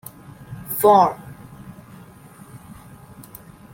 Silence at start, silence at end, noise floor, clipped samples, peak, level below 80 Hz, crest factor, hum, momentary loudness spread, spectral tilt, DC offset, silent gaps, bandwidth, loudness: 0.5 s; 1.15 s; -44 dBFS; under 0.1%; -2 dBFS; -56 dBFS; 22 dB; none; 28 LU; -5.5 dB/octave; under 0.1%; none; 17 kHz; -17 LUFS